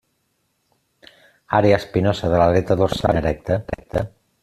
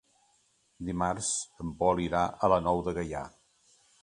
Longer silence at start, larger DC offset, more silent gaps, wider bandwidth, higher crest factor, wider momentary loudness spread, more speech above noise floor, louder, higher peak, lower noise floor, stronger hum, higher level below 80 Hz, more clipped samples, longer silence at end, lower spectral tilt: first, 1.5 s vs 0.8 s; neither; neither; first, 13.5 kHz vs 11 kHz; about the same, 18 dB vs 22 dB; second, 10 LU vs 13 LU; first, 51 dB vs 40 dB; first, -19 LUFS vs -30 LUFS; first, -2 dBFS vs -10 dBFS; about the same, -69 dBFS vs -70 dBFS; neither; first, -40 dBFS vs -52 dBFS; neither; second, 0.35 s vs 0.75 s; first, -7 dB/octave vs -4.5 dB/octave